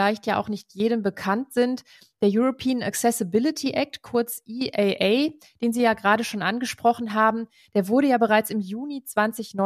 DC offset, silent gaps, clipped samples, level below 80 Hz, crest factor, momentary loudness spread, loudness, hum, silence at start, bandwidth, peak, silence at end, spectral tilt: under 0.1%; none; under 0.1%; -66 dBFS; 18 dB; 8 LU; -24 LUFS; none; 0 s; 15.5 kHz; -6 dBFS; 0 s; -4.5 dB/octave